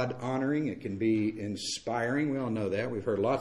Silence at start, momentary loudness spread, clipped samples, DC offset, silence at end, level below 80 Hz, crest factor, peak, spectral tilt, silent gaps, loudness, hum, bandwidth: 0 s; 5 LU; under 0.1%; under 0.1%; 0 s; -62 dBFS; 14 dB; -16 dBFS; -5.5 dB/octave; none; -31 LUFS; none; 12.5 kHz